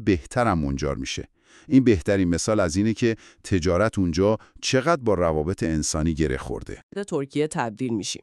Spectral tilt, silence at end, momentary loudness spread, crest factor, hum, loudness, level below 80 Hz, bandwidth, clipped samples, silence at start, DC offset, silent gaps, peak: -5.5 dB/octave; 0.05 s; 9 LU; 18 dB; none; -23 LUFS; -40 dBFS; 12.5 kHz; under 0.1%; 0 s; under 0.1%; 6.83-6.89 s; -4 dBFS